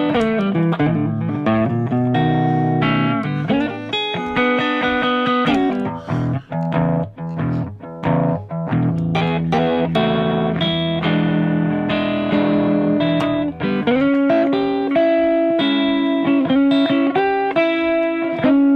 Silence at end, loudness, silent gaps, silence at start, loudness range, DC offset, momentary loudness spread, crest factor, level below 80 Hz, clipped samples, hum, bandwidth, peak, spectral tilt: 0 s; -18 LUFS; none; 0 s; 4 LU; under 0.1%; 6 LU; 10 dB; -46 dBFS; under 0.1%; none; 7.2 kHz; -6 dBFS; -8 dB/octave